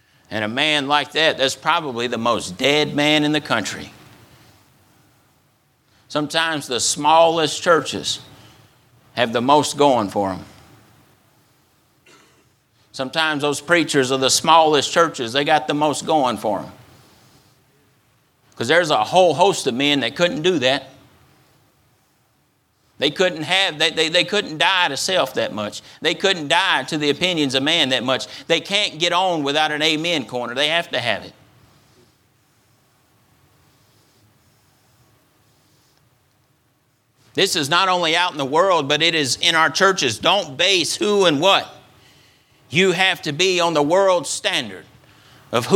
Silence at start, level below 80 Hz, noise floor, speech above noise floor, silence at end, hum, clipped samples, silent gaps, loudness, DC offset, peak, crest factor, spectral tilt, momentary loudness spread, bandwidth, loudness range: 0.3 s; -64 dBFS; -63 dBFS; 44 dB; 0 s; none; under 0.1%; none; -18 LUFS; under 0.1%; 0 dBFS; 20 dB; -3 dB/octave; 9 LU; 17.5 kHz; 8 LU